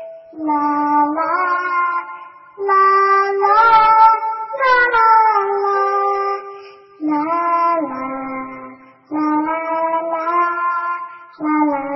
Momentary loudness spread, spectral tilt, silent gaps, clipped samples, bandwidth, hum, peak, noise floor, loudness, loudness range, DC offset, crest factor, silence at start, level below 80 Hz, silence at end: 15 LU; -6 dB/octave; none; under 0.1%; 6 kHz; none; 0 dBFS; -39 dBFS; -16 LUFS; 8 LU; under 0.1%; 16 dB; 0 s; -58 dBFS; 0 s